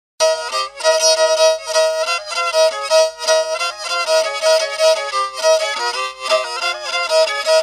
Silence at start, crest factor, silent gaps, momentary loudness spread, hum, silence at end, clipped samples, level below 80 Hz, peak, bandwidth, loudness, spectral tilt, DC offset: 0.2 s; 14 dB; none; 7 LU; none; 0 s; under 0.1%; -62 dBFS; -2 dBFS; 14.5 kHz; -16 LUFS; 3 dB/octave; under 0.1%